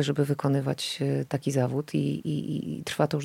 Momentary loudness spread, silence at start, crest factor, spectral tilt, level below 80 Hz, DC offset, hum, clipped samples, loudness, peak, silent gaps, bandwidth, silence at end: 5 LU; 0 s; 20 dB; -6 dB/octave; -68 dBFS; under 0.1%; none; under 0.1%; -28 LUFS; -8 dBFS; none; 16 kHz; 0 s